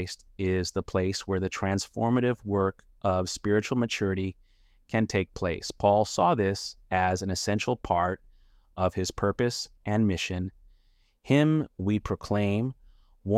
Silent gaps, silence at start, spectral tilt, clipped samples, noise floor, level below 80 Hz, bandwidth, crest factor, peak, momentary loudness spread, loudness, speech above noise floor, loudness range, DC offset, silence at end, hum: none; 0 s; -5.5 dB/octave; under 0.1%; -64 dBFS; -52 dBFS; 15 kHz; 20 dB; -8 dBFS; 8 LU; -28 LUFS; 37 dB; 2 LU; under 0.1%; 0 s; none